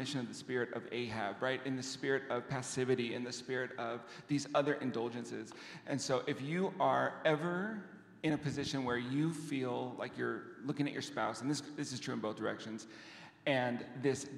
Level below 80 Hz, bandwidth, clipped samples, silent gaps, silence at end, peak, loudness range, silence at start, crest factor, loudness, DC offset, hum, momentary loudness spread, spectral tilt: -76 dBFS; 13.5 kHz; under 0.1%; none; 0 s; -18 dBFS; 3 LU; 0 s; 20 dB; -38 LUFS; under 0.1%; none; 10 LU; -5 dB/octave